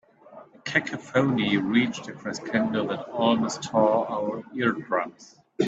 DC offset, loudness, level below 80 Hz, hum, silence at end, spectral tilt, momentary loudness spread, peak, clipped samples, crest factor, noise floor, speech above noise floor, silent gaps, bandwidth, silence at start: under 0.1%; -25 LUFS; -66 dBFS; none; 0 s; -5.5 dB/octave; 12 LU; -6 dBFS; under 0.1%; 20 dB; -49 dBFS; 24 dB; none; 8 kHz; 0.3 s